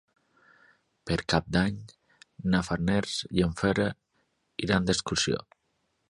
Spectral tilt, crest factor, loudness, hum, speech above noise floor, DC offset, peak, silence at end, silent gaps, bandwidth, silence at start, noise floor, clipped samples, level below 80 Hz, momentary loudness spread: -5 dB/octave; 22 dB; -28 LUFS; none; 48 dB; under 0.1%; -8 dBFS; 0.75 s; none; 11.5 kHz; 1.05 s; -76 dBFS; under 0.1%; -48 dBFS; 10 LU